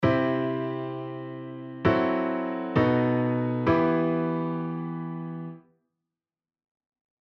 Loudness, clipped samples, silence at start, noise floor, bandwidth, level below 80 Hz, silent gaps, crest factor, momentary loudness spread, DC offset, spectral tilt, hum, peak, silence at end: -27 LUFS; under 0.1%; 0 s; under -90 dBFS; 6 kHz; -56 dBFS; none; 20 dB; 14 LU; under 0.1%; -9.5 dB/octave; none; -8 dBFS; 1.75 s